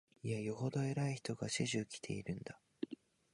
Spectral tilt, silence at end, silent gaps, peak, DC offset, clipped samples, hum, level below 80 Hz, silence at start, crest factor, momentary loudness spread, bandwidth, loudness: -5 dB/octave; 0.4 s; none; -22 dBFS; under 0.1%; under 0.1%; none; -72 dBFS; 0.25 s; 18 dB; 10 LU; 11.5 kHz; -41 LUFS